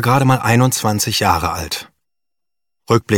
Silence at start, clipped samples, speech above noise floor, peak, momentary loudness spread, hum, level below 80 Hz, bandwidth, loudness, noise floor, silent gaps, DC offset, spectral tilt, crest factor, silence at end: 0 s; under 0.1%; 71 dB; 0 dBFS; 10 LU; none; -42 dBFS; 18 kHz; -16 LUFS; -86 dBFS; none; under 0.1%; -4.5 dB/octave; 16 dB; 0 s